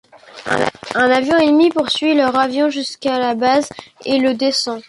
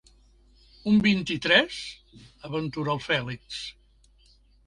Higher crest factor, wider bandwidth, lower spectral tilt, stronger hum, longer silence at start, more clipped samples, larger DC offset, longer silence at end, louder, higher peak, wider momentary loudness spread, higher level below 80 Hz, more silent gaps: second, 14 dB vs 22 dB; about the same, 11.5 kHz vs 11 kHz; second, -3.5 dB/octave vs -5 dB/octave; neither; second, 0.35 s vs 0.85 s; neither; neither; second, 0.05 s vs 0.95 s; first, -16 LUFS vs -25 LUFS; first, -2 dBFS vs -6 dBFS; second, 8 LU vs 16 LU; about the same, -56 dBFS vs -56 dBFS; neither